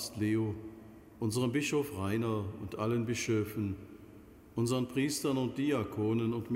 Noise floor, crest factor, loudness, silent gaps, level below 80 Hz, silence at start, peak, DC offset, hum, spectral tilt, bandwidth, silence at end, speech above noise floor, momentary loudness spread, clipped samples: -54 dBFS; 14 dB; -34 LUFS; none; -62 dBFS; 0 s; -20 dBFS; under 0.1%; none; -5.5 dB/octave; 16 kHz; 0 s; 22 dB; 13 LU; under 0.1%